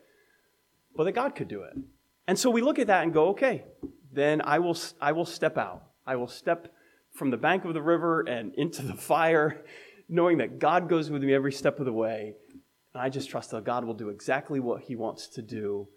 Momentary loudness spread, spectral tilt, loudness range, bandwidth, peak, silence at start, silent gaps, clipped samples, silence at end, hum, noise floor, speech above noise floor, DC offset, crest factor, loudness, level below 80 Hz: 13 LU; -5.5 dB/octave; 6 LU; 16 kHz; -8 dBFS; 0.95 s; none; under 0.1%; 0.1 s; none; -70 dBFS; 43 dB; under 0.1%; 20 dB; -28 LUFS; -70 dBFS